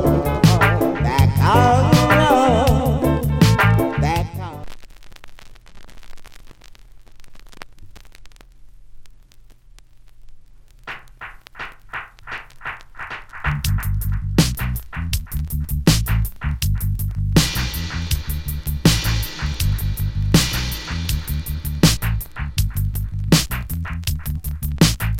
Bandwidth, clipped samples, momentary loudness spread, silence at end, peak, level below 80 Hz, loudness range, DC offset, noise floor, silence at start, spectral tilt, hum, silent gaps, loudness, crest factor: 17 kHz; under 0.1%; 18 LU; 0 s; 0 dBFS; -28 dBFS; 19 LU; under 0.1%; -44 dBFS; 0 s; -5 dB/octave; none; none; -19 LUFS; 20 dB